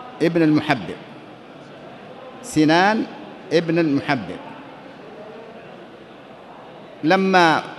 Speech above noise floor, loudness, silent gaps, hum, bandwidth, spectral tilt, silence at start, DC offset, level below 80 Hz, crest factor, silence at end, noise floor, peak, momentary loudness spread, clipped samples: 23 dB; -19 LUFS; none; none; 12 kHz; -5.5 dB/octave; 0 s; under 0.1%; -60 dBFS; 20 dB; 0 s; -41 dBFS; -2 dBFS; 25 LU; under 0.1%